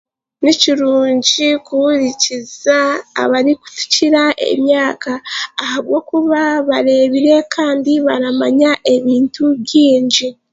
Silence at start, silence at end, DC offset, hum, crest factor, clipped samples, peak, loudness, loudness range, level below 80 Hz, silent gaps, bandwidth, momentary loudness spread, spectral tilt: 0.4 s; 0.2 s; under 0.1%; none; 14 dB; under 0.1%; 0 dBFS; -13 LUFS; 2 LU; -60 dBFS; none; 7.8 kHz; 6 LU; -2.5 dB/octave